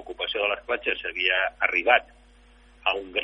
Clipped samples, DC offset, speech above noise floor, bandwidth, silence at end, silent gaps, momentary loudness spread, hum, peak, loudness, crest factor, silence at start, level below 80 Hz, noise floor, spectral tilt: under 0.1%; under 0.1%; 29 dB; 9.6 kHz; 0 s; none; 7 LU; none; -4 dBFS; -24 LUFS; 22 dB; 0 s; -56 dBFS; -54 dBFS; -3.5 dB/octave